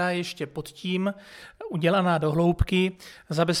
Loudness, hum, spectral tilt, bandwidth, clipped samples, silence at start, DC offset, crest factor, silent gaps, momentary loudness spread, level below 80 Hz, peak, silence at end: -26 LUFS; none; -6 dB/octave; 15 kHz; under 0.1%; 0 s; under 0.1%; 16 dB; none; 17 LU; -40 dBFS; -10 dBFS; 0 s